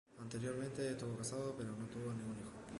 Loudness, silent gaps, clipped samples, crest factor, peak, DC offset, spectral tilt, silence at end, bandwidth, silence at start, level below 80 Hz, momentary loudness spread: -45 LUFS; none; under 0.1%; 14 dB; -30 dBFS; under 0.1%; -5.5 dB/octave; 0 s; 11.5 kHz; 0.1 s; -68 dBFS; 5 LU